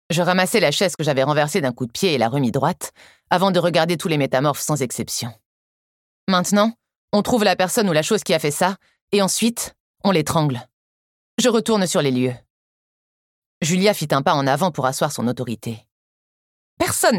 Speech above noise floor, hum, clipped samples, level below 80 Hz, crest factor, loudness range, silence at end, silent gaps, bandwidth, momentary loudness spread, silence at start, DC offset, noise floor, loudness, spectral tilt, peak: over 71 dB; none; under 0.1%; -56 dBFS; 20 dB; 2 LU; 0 s; 5.45-6.27 s, 6.98-7.08 s, 9.01-9.08 s, 9.80-9.94 s, 10.73-11.37 s, 12.50-13.61 s, 15.91-16.77 s; 17.5 kHz; 10 LU; 0.1 s; under 0.1%; under -90 dBFS; -19 LUFS; -4.5 dB/octave; -2 dBFS